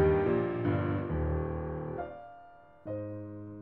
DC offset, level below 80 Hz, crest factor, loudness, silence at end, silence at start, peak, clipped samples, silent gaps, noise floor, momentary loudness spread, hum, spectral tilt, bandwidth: under 0.1%; -44 dBFS; 16 dB; -33 LUFS; 0 s; 0 s; -16 dBFS; under 0.1%; none; -55 dBFS; 19 LU; none; -11.5 dB/octave; 4.3 kHz